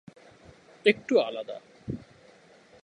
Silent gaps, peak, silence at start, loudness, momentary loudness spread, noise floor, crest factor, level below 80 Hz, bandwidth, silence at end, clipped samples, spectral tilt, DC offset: none; -6 dBFS; 0.85 s; -27 LUFS; 16 LU; -56 dBFS; 26 dB; -62 dBFS; 10.5 kHz; 0.85 s; under 0.1%; -5.5 dB/octave; under 0.1%